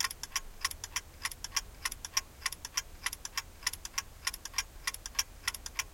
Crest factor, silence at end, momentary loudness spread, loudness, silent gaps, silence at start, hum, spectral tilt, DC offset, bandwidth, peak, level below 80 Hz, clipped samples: 26 dB; 0 s; 5 LU; -36 LUFS; none; 0 s; none; 1 dB/octave; under 0.1%; 17 kHz; -12 dBFS; -52 dBFS; under 0.1%